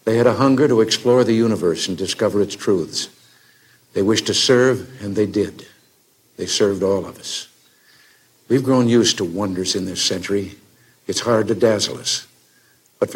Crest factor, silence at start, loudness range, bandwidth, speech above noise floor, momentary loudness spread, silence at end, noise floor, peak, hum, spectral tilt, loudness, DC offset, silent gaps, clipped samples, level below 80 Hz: 16 dB; 0.05 s; 4 LU; 16.5 kHz; 39 dB; 11 LU; 0 s; -57 dBFS; -2 dBFS; none; -4 dB/octave; -18 LUFS; under 0.1%; none; under 0.1%; -62 dBFS